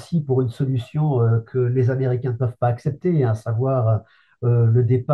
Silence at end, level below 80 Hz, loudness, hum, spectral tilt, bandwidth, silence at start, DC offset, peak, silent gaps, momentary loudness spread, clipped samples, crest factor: 0 s; -56 dBFS; -21 LUFS; none; -10 dB/octave; 4.3 kHz; 0 s; under 0.1%; -6 dBFS; none; 6 LU; under 0.1%; 14 dB